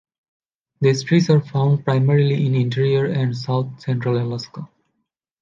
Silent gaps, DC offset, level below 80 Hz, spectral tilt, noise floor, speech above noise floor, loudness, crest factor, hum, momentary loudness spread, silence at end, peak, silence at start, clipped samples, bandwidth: none; under 0.1%; -62 dBFS; -7.5 dB/octave; -75 dBFS; 57 dB; -19 LUFS; 16 dB; none; 8 LU; 0.75 s; -4 dBFS; 0.8 s; under 0.1%; 7.4 kHz